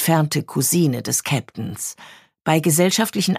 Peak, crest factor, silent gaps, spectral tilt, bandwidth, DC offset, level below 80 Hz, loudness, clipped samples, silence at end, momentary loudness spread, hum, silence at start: -2 dBFS; 18 dB; none; -4.5 dB/octave; 15.5 kHz; under 0.1%; -60 dBFS; -19 LUFS; under 0.1%; 0 s; 12 LU; none; 0 s